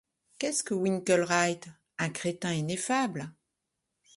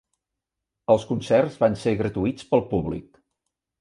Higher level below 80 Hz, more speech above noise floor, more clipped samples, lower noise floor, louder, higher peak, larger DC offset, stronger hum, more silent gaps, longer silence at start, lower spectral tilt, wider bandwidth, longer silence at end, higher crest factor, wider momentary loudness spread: second, -72 dBFS vs -50 dBFS; second, 54 dB vs 62 dB; neither; about the same, -84 dBFS vs -85 dBFS; second, -29 LUFS vs -23 LUFS; second, -12 dBFS vs -4 dBFS; neither; neither; neither; second, 0.4 s vs 0.9 s; second, -4 dB/octave vs -7 dB/octave; about the same, 11.5 kHz vs 11 kHz; about the same, 0.85 s vs 0.8 s; about the same, 20 dB vs 20 dB; first, 14 LU vs 9 LU